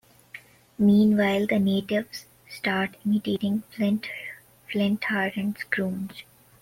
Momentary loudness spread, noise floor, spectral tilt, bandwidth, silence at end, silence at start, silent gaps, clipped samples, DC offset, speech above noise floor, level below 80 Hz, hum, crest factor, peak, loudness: 22 LU; -48 dBFS; -6.5 dB/octave; 16 kHz; 0.4 s; 0.35 s; none; under 0.1%; under 0.1%; 24 dB; -62 dBFS; none; 18 dB; -8 dBFS; -25 LUFS